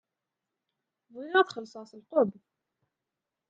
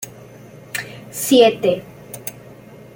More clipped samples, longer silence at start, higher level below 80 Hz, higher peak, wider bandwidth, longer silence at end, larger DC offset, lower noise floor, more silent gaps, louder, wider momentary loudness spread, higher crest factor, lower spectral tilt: neither; first, 1.15 s vs 0 s; second, -84 dBFS vs -60 dBFS; second, -8 dBFS vs -2 dBFS; second, 7.6 kHz vs 17 kHz; first, 1.2 s vs 0.4 s; neither; first, -88 dBFS vs -41 dBFS; neither; second, -28 LUFS vs -17 LUFS; about the same, 19 LU vs 20 LU; first, 24 dB vs 18 dB; first, -5.5 dB/octave vs -3.5 dB/octave